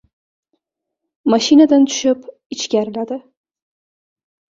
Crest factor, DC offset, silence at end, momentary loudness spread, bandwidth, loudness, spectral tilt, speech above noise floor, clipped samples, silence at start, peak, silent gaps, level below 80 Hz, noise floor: 16 dB; under 0.1%; 1.4 s; 16 LU; 7.8 kHz; -15 LUFS; -4 dB/octave; 65 dB; under 0.1%; 1.25 s; -2 dBFS; 2.46-2.50 s; -62 dBFS; -79 dBFS